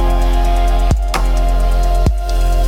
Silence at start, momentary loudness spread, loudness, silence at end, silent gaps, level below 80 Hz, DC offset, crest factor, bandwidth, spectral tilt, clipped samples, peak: 0 s; 2 LU; -16 LUFS; 0 s; none; -12 dBFS; under 0.1%; 10 dB; 14 kHz; -6 dB/octave; under 0.1%; -2 dBFS